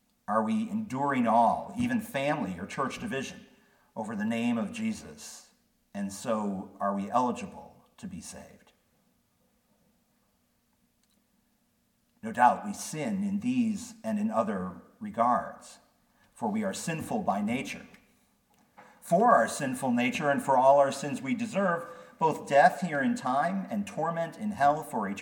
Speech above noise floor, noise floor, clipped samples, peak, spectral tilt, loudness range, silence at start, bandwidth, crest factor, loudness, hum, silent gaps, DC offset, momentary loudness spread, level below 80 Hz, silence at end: 43 dB; -72 dBFS; under 0.1%; -8 dBFS; -5.5 dB/octave; 9 LU; 0.3 s; 18 kHz; 22 dB; -29 LUFS; none; none; under 0.1%; 19 LU; -70 dBFS; 0 s